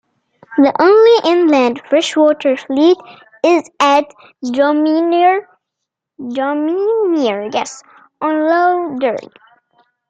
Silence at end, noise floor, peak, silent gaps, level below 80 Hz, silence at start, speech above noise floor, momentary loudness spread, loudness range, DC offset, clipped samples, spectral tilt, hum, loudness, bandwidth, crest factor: 0.85 s; -79 dBFS; 0 dBFS; none; -64 dBFS; 0.5 s; 66 dB; 12 LU; 5 LU; under 0.1%; under 0.1%; -3.5 dB/octave; none; -14 LUFS; 9 kHz; 14 dB